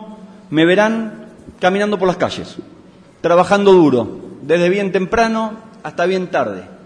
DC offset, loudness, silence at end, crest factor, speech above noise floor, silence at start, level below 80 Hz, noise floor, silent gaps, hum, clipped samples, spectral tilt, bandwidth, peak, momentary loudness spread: under 0.1%; -15 LUFS; 0.1 s; 16 dB; 28 dB; 0 s; -48 dBFS; -43 dBFS; none; none; under 0.1%; -6 dB/octave; 10 kHz; 0 dBFS; 18 LU